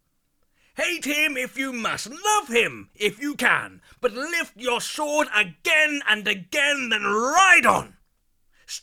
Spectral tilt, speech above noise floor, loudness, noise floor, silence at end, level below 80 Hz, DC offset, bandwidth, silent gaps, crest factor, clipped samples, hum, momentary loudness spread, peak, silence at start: -1.5 dB/octave; 46 dB; -21 LUFS; -69 dBFS; 0.05 s; -60 dBFS; under 0.1%; 18.5 kHz; none; 20 dB; under 0.1%; none; 11 LU; -2 dBFS; 0.75 s